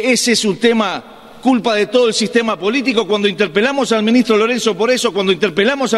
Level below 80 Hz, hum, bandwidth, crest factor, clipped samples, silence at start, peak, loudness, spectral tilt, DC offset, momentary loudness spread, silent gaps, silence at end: -56 dBFS; none; 13 kHz; 14 dB; under 0.1%; 0 s; 0 dBFS; -14 LUFS; -3.5 dB/octave; under 0.1%; 4 LU; none; 0 s